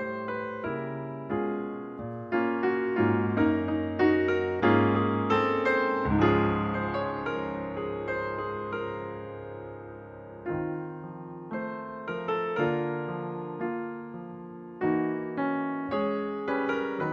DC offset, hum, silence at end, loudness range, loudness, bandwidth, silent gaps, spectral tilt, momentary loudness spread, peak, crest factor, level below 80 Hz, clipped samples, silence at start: under 0.1%; none; 0 s; 10 LU; -29 LUFS; 7 kHz; none; -8.5 dB/octave; 15 LU; -10 dBFS; 20 dB; -54 dBFS; under 0.1%; 0 s